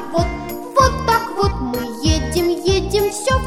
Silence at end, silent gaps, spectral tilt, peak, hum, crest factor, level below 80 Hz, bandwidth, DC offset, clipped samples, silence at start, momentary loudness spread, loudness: 0 s; none; -5 dB/octave; 0 dBFS; none; 18 dB; -28 dBFS; 19.5 kHz; under 0.1%; under 0.1%; 0 s; 8 LU; -18 LUFS